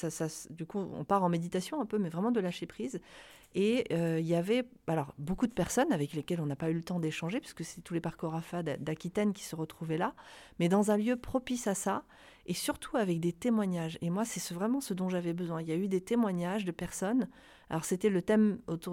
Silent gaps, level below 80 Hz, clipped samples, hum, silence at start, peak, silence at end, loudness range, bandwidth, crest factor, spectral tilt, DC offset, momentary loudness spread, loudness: none; -60 dBFS; under 0.1%; none; 0 s; -16 dBFS; 0 s; 3 LU; 16.5 kHz; 18 dB; -6 dB/octave; under 0.1%; 10 LU; -33 LUFS